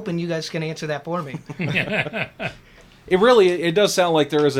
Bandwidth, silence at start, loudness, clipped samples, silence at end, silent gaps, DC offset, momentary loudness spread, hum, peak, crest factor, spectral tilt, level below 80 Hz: 16 kHz; 0 s; -20 LUFS; under 0.1%; 0 s; none; under 0.1%; 13 LU; none; -4 dBFS; 16 dB; -5 dB/octave; -54 dBFS